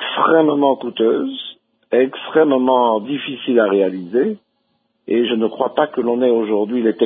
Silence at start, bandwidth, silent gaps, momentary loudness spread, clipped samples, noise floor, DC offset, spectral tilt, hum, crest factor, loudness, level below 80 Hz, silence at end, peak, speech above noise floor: 0 s; 3.9 kHz; none; 8 LU; under 0.1%; -67 dBFS; under 0.1%; -10.5 dB/octave; none; 16 dB; -17 LUFS; -70 dBFS; 0 s; -2 dBFS; 51 dB